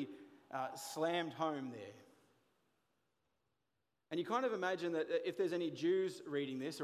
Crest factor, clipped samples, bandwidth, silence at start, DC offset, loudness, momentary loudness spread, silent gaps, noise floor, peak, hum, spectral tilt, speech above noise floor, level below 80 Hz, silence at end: 18 dB; under 0.1%; 15.5 kHz; 0 s; under 0.1%; -40 LUFS; 12 LU; none; -88 dBFS; -24 dBFS; none; -5 dB/octave; 49 dB; under -90 dBFS; 0 s